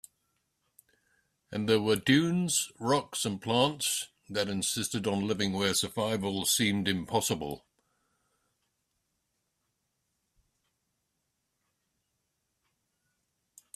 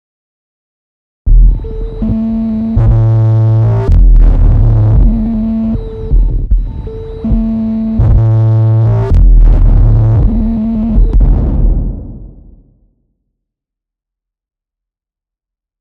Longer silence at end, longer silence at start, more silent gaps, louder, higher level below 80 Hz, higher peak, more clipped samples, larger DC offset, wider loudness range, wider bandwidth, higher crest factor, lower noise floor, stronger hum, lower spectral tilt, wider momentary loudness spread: first, 6.2 s vs 3.55 s; first, 1.5 s vs 1.25 s; neither; second, -29 LUFS vs -11 LUFS; second, -66 dBFS vs -12 dBFS; second, -10 dBFS vs 0 dBFS; neither; neither; about the same, 7 LU vs 6 LU; first, 15.5 kHz vs 2.4 kHz; first, 22 dB vs 10 dB; second, -81 dBFS vs -86 dBFS; neither; second, -3.5 dB/octave vs -11.5 dB/octave; about the same, 8 LU vs 9 LU